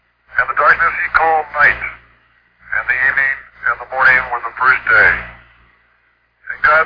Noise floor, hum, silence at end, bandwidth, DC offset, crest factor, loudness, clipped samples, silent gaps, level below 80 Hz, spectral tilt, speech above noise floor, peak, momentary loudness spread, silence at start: -58 dBFS; none; 0 s; 5.2 kHz; under 0.1%; 16 dB; -13 LUFS; under 0.1%; none; -44 dBFS; -5 dB/octave; 45 dB; 0 dBFS; 11 LU; 0.35 s